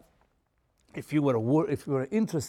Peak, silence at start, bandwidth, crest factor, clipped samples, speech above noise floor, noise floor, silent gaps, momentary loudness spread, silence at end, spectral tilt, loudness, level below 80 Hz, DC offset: -14 dBFS; 0.95 s; 15 kHz; 16 dB; under 0.1%; 45 dB; -72 dBFS; none; 13 LU; 0 s; -7.5 dB/octave; -28 LUFS; -64 dBFS; under 0.1%